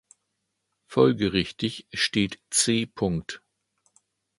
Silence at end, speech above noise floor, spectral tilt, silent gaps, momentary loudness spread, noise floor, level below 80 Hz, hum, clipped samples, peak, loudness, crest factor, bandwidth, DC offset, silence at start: 1 s; 54 dB; -4 dB/octave; none; 10 LU; -79 dBFS; -52 dBFS; none; under 0.1%; -4 dBFS; -25 LUFS; 22 dB; 11.5 kHz; under 0.1%; 0.9 s